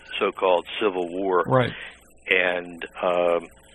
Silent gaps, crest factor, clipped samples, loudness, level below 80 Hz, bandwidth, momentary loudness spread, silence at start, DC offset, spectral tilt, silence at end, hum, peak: none; 22 dB; under 0.1%; -23 LUFS; -58 dBFS; 10.5 kHz; 14 LU; 0.05 s; under 0.1%; -6.5 dB/octave; 0.25 s; none; -2 dBFS